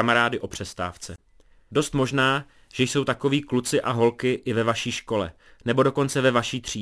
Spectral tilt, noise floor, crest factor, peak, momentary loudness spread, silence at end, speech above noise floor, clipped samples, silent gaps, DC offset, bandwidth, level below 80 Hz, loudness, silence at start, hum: -4.5 dB/octave; -55 dBFS; 20 dB; -4 dBFS; 11 LU; 0 s; 31 dB; under 0.1%; none; under 0.1%; 11 kHz; -52 dBFS; -24 LUFS; 0 s; none